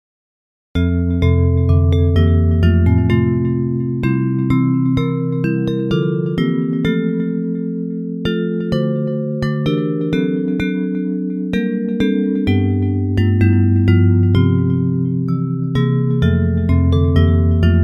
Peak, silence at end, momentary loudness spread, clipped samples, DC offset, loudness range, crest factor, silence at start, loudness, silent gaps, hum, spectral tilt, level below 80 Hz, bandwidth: 0 dBFS; 0 s; 6 LU; under 0.1%; under 0.1%; 4 LU; 14 dB; 0.75 s; -16 LUFS; none; none; -9.5 dB/octave; -30 dBFS; 5.6 kHz